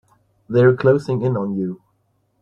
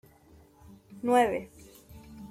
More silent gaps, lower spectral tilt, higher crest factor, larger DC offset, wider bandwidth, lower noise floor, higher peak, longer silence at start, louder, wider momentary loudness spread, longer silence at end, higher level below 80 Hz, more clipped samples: neither; first, -9 dB/octave vs -5 dB/octave; about the same, 18 dB vs 20 dB; neither; second, 7.2 kHz vs 16 kHz; first, -65 dBFS vs -58 dBFS; first, -2 dBFS vs -12 dBFS; second, 0.5 s vs 0.9 s; first, -18 LUFS vs -27 LUFS; second, 13 LU vs 26 LU; first, 0.65 s vs 0.05 s; about the same, -56 dBFS vs -60 dBFS; neither